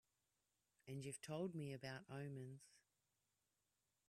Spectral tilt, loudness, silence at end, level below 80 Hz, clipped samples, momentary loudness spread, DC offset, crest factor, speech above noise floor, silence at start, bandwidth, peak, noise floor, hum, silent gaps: -5.5 dB/octave; -52 LUFS; 1.3 s; -88 dBFS; under 0.1%; 10 LU; under 0.1%; 18 dB; 38 dB; 0.85 s; 13.5 kHz; -36 dBFS; -90 dBFS; none; none